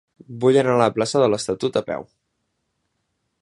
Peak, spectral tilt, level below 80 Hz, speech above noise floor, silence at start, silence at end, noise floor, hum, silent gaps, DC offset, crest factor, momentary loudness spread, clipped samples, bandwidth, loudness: -2 dBFS; -5.5 dB/octave; -60 dBFS; 55 dB; 0.3 s; 1.4 s; -74 dBFS; none; none; under 0.1%; 20 dB; 14 LU; under 0.1%; 11.5 kHz; -19 LUFS